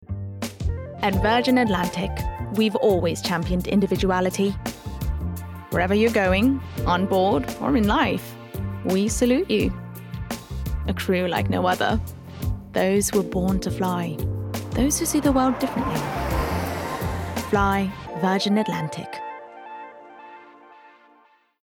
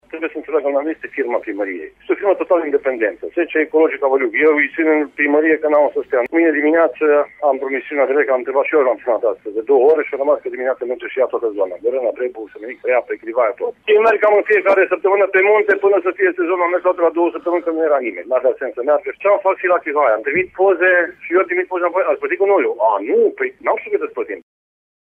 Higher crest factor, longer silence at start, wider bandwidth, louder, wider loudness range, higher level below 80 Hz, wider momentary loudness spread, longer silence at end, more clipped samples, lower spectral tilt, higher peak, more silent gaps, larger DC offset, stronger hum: about the same, 14 dB vs 12 dB; second, 0 s vs 0.15 s; first, 19 kHz vs 4.1 kHz; second, -23 LUFS vs -16 LUFS; about the same, 4 LU vs 4 LU; first, -36 dBFS vs -64 dBFS; first, 13 LU vs 8 LU; about the same, 0.75 s vs 0.75 s; neither; about the same, -5.5 dB/octave vs -6.5 dB/octave; second, -8 dBFS vs -4 dBFS; neither; neither; neither